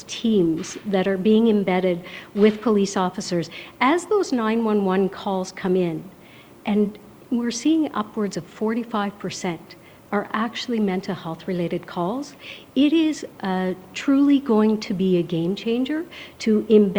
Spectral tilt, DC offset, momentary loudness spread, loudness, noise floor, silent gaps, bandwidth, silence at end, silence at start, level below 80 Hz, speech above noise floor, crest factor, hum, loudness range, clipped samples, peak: -6 dB/octave; under 0.1%; 11 LU; -22 LUFS; -46 dBFS; none; over 20 kHz; 0 s; 0 s; -60 dBFS; 25 dB; 18 dB; none; 6 LU; under 0.1%; -4 dBFS